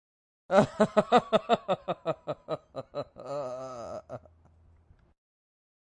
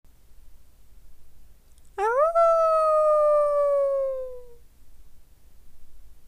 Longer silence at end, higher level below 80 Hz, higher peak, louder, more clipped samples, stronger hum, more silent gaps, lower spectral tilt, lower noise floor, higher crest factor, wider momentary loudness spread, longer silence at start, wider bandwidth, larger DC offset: first, 1.8 s vs 0 s; second, -64 dBFS vs -52 dBFS; first, -6 dBFS vs -12 dBFS; second, -29 LUFS vs -22 LUFS; neither; neither; neither; first, -6 dB/octave vs -4 dB/octave; first, -61 dBFS vs -48 dBFS; first, 24 dB vs 14 dB; first, 16 LU vs 12 LU; first, 0.5 s vs 0.3 s; about the same, 10.5 kHz vs 11.5 kHz; neither